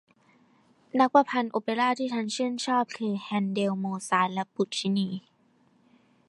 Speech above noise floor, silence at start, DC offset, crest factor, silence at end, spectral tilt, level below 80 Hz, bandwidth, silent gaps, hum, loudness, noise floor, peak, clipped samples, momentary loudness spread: 38 dB; 0.95 s; under 0.1%; 22 dB; 1.1 s; -5 dB/octave; -78 dBFS; 11.5 kHz; none; none; -27 LUFS; -65 dBFS; -6 dBFS; under 0.1%; 9 LU